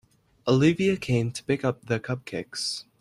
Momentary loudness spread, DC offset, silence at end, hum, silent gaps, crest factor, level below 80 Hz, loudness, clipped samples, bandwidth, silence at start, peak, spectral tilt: 11 LU; under 0.1%; 0.2 s; none; none; 18 dB; -58 dBFS; -26 LUFS; under 0.1%; 12.5 kHz; 0.45 s; -8 dBFS; -5.5 dB/octave